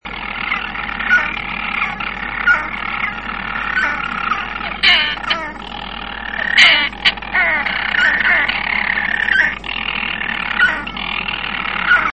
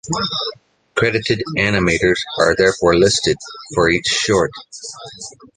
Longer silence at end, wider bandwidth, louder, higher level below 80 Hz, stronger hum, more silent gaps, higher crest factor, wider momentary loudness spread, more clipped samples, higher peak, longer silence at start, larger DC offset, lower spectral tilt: about the same, 0 s vs 0.1 s; about the same, 11 kHz vs 10 kHz; about the same, -16 LUFS vs -16 LUFS; about the same, -38 dBFS vs -42 dBFS; neither; neither; about the same, 18 dB vs 16 dB; second, 11 LU vs 18 LU; neither; about the same, 0 dBFS vs -2 dBFS; about the same, 0.05 s vs 0.05 s; first, 0.4% vs under 0.1%; second, -2.5 dB/octave vs -4 dB/octave